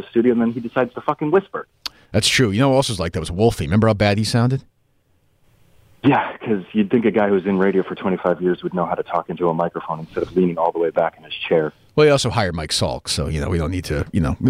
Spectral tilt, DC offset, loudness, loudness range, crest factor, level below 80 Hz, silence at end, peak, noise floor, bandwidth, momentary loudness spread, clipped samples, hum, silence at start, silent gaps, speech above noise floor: -5.5 dB/octave; under 0.1%; -19 LUFS; 3 LU; 16 dB; -40 dBFS; 0 s; -4 dBFS; -61 dBFS; 15.5 kHz; 8 LU; under 0.1%; none; 0 s; none; 42 dB